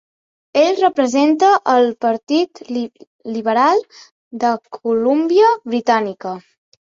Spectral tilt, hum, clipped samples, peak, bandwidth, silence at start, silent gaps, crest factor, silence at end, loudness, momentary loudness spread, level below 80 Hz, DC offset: -4.5 dB/octave; none; under 0.1%; -2 dBFS; 7.8 kHz; 0.55 s; 2.23-2.27 s, 3.07-3.19 s, 4.11-4.31 s; 14 dB; 0.5 s; -16 LUFS; 14 LU; -66 dBFS; under 0.1%